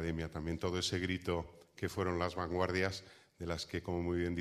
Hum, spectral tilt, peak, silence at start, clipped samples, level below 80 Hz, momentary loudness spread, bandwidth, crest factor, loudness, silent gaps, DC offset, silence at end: none; -5 dB/octave; -16 dBFS; 0 s; under 0.1%; -54 dBFS; 7 LU; 15 kHz; 20 dB; -38 LUFS; none; under 0.1%; 0 s